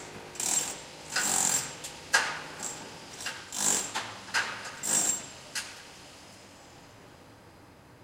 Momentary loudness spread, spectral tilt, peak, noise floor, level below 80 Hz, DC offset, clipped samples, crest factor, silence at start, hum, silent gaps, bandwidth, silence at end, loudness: 22 LU; 0 dB/octave; -10 dBFS; -54 dBFS; -66 dBFS; under 0.1%; under 0.1%; 24 dB; 0 s; none; none; 16.5 kHz; 0 s; -29 LUFS